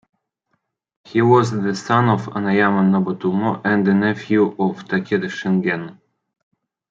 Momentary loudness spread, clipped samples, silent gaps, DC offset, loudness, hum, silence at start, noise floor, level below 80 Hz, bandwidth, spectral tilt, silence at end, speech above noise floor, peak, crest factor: 8 LU; under 0.1%; none; under 0.1%; -18 LUFS; none; 1.1 s; -72 dBFS; -64 dBFS; 7.6 kHz; -7.5 dB/octave; 1 s; 54 dB; -2 dBFS; 18 dB